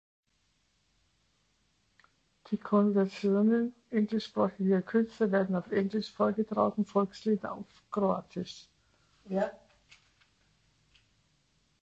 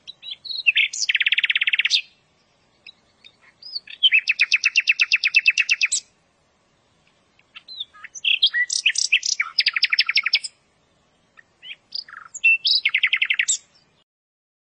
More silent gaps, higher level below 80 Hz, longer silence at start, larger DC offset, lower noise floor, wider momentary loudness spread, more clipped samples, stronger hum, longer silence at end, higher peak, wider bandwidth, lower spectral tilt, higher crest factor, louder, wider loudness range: neither; first, -72 dBFS vs -78 dBFS; first, 2.5 s vs 0.05 s; neither; first, -74 dBFS vs -63 dBFS; second, 11 LU vs 18 LU; neither; neither; first, 2.3 s vs 1.15 s; second, -12 dBFS vs -4 dBFS; second, 7.8 kHz vs 10 kHz; first, -8 dB/octave vs 5.5 dB/octave; about the same, 20 dB vs 18 dB; second, -31 LUFS vs -18 LUFS; first, 8 LU vs 4 LU